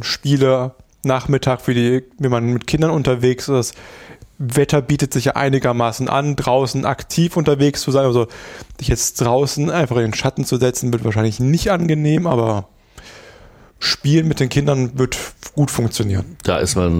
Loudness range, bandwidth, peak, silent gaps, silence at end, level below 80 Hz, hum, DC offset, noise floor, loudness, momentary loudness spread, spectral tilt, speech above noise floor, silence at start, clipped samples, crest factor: 2 LU; 16.5 kHz; -4 dBFS; none; 0 s; -38 dBFS; none; under 0.1%; -45 dBFS; -18 LUFS; 6 LU; -5.5 dB/octave; 28 dB; 0 s; under 0.1%; 14 dB